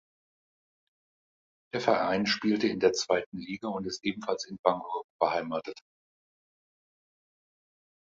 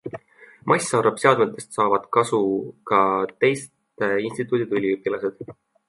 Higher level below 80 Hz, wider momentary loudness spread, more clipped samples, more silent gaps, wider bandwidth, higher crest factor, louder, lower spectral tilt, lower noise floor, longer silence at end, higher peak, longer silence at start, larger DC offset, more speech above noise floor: about the same, -68 dBFS vs -66 dBFS; second, 11 LU vs 15 LU; neither; first, 3.26-3.32 s, 4.59-4.64 s, 5.04-5.19 s vs none; second, 7.8 kHz vs 11.5 kHz; first, 26 dB vs 20 dB; second, -30 LUFS vs -22 LUFS; about the same, -4 dB/octave vs -5 dB/octave; first, under -90 dBFS vs -50 dBFS; first, 2.2 s vs 0.35 s; about the same, -6 dBFS vs -4 dBFS; first, 1.75 s vs 0.05 s; neither; first, over 61 dB vs 29 dB